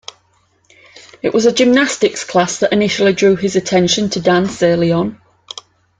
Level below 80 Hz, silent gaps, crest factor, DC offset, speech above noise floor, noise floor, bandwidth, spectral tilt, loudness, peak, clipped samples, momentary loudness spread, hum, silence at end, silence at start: -54 dBFS; none; 14 dB; under 0.1%; 44 dB; -58 dBFS; 9.6 kHz; -4.5 dB/octave; -14 LUFS; 0 dBFS; under 0.1%; 15 LU; none; 0.85 s; 0.95 s